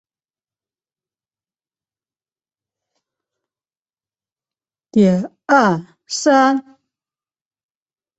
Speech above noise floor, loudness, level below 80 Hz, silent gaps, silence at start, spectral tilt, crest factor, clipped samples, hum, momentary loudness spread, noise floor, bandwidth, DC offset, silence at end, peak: over 76 dB; -16 LUFS; -64 dBFS; none; 4.95 s; -5.5 dB/octave; 20 dB; under 0.1%; none; 10 LU; under -90 dBFS; 8.2 kHz; under 0.1%; 1.55 s; -2 dBFS